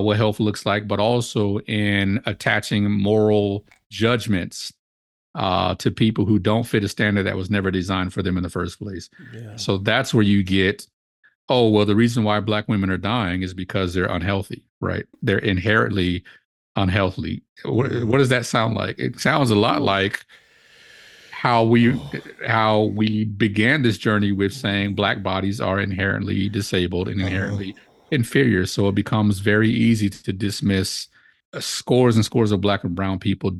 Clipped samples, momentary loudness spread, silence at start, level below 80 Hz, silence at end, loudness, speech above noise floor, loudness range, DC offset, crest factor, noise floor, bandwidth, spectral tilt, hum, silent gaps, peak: under 0.1%; 11 LU; 0 s; -50 dBFS; 0 s; -21 LUFS; 31 dB; 3 LU; under 0.1%; 20 dB; -51 dBFS; 12.5 kHz; -6 dB/octave; none; 3.86-3.90 s, 4.79-5.34 s, 10.93-11.23 s, 11.35-11.48 s, 14.69-14.81 s, 16.45-16.75 s, 17.49-17.56 s, 31.45-31.52 s; -2 dBFS